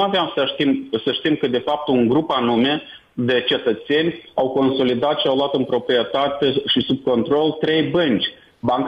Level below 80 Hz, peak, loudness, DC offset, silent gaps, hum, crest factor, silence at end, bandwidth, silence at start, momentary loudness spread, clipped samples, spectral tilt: -56 dBFS; -8 dBFS; -19 LUFS; under 0.1%; none; none; 12 dB; 0 s; 6.4 kHz; 0 s; 4 LU; under 0.1%; -7.5 dB/octave